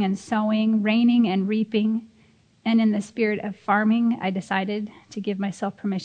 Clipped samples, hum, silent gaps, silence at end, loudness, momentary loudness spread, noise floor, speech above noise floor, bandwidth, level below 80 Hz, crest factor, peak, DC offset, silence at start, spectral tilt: under 0.1%; none; none; 0 s; -23 LUFS; 10 LU; -58 dBFS; 35 dB; 9.2 kHz; -70 dBFS; 16 dB; -6 dBFS; under 0.1%; 0 s; -6.5 dB/octave